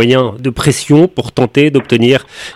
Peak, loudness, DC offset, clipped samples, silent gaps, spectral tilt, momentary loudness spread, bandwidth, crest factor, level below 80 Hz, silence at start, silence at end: 0 dBFS; -11 LUFS; under 0.1%; 0.6%; none; -5.5 dB/octave; 5 LU; 14.5 kHz; 10 dB; -40 dBFS; 0 s; 0.05 s